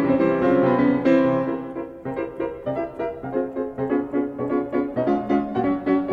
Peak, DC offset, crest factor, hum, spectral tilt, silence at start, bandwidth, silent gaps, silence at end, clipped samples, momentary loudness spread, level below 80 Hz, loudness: -8 dBFS; under 0.1%; 14 dB; none; -9 dB/octave; 0 s; 5 kHz; none; 0 s; under 0.1%; 11 LU; -52 dBFS; -23 LUFS